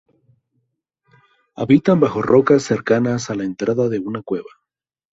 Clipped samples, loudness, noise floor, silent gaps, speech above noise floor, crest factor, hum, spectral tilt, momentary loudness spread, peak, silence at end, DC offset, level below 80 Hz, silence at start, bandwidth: under 0.1%; -18 LUFS; -83 dBFS; none; 66 dB; 18 dB; none; -7 dB/octave; 12 LU; -2 dBFS; 0.7 s; under 0.1%; -56 dBFS; 1.6 s; 7.8 kHz